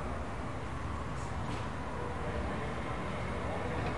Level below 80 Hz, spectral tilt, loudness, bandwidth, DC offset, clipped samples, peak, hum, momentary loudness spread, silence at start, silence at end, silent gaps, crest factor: -46 dBFS; -6.5 dB/octave; -38 LUFS; 11.5 kHz; 0.6%; under 0.1%; -22 dBFS; none; 3 LU; 0 s; 0 s; none; 14 dB